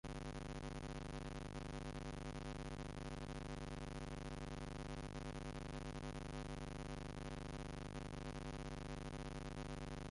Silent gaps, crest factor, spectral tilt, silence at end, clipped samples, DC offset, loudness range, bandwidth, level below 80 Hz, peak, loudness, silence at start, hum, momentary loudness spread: none; 12 dB; -5.5 dB/octave; 0 s; under 0.1%; under 0.1%; 0 LU; 11.5 kHz; -54 dBFS; -36 dBFS; -50 LUFS; 0.05 s; none; 1 LU